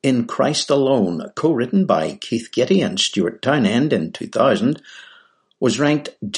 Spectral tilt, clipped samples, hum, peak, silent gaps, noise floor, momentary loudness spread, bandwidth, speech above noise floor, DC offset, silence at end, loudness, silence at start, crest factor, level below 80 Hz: -5 dB/octave; under 0.1%; none; -2 dBFS; none; -52 dBFS; 6 LU; 11.5 kHz; 34 dB; under 0.1%; 0 s; -19 LUFS; 0.05 s; 16 dB; -62 dBFS